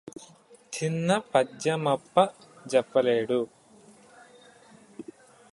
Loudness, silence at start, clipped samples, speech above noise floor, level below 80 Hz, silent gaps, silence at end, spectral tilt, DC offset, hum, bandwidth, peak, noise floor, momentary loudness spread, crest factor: -26 LUFS; 0.05 s; under 0.1%; 30 dB; -72 dBFS; none; 0.5 s; -5 dB/octave; under 0.1%; none; 11.5 kHz; -6 dBFS; -55 dBFS; 21 LU; 22 dB